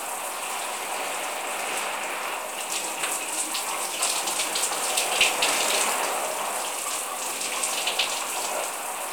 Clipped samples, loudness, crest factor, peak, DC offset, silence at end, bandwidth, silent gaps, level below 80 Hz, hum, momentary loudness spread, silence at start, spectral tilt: under 0.1%; -25 LUFS; 20 dB; -8 dBFS; 0.1%; 0 s; over 20 kHz; none; -72 dBFS; none; 8 LU; 0 s; 1.5 dB/octave